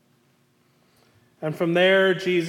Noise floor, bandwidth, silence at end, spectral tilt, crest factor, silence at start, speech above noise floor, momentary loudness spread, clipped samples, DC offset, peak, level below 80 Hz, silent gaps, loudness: -63 dBFS; 14 kHz; 0 s; -6 dB/octave; 16 dB; 1.4 s; 43 dB; 15 LU; under 0.1%; under 0.1%; -8 dBFS; -76 dBFS; none; -21 LUFS